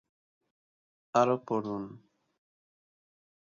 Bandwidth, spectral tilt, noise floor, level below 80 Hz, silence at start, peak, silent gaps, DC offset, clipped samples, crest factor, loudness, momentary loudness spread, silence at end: 7.4 kHz; -6.5 dB/octave; under -90 dBFS; -76 dBFS; 1.15 s; -12 dBFS; none; under 0.1%; under 0.1%; 24 dB; -30 LUFS; 13 LU; 1.45 s